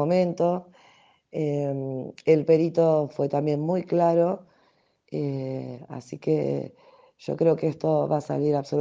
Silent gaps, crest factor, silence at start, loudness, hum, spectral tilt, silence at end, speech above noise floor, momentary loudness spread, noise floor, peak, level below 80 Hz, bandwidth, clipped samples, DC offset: none; 18 dB; 0 s; -25 LUFS; none; -8.5 dB/octave; 0 s; 41 dB; 14 LU; -65 dBFS; -6 dBFS; -68 dBFS; 7.6 kHz; under 0.1%; under 0.1%